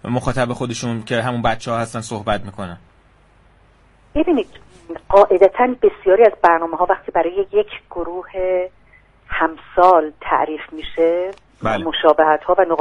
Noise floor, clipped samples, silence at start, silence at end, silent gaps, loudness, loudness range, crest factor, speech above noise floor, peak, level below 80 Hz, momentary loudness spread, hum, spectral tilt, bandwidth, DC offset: -52 dBFS; under 0.1%; 0.05 s; 0 s; none; -17 LUFS; 9 LU; 18 dB; 35 dB; 0 dBFS; -42 dBFS; 14 LU; none; -5.5 dB/octave; 11.5 kHz; under 0.1%